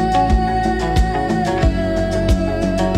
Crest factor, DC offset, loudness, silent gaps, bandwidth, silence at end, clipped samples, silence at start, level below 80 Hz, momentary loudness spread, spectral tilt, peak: 12 dB; under 0.1%; -18 LUFS; none; 13 kHz; 0 s; under 0.1%; 0 s; -22 dBFS; 3 LU; -6.5 dB/octave; -4 dBFS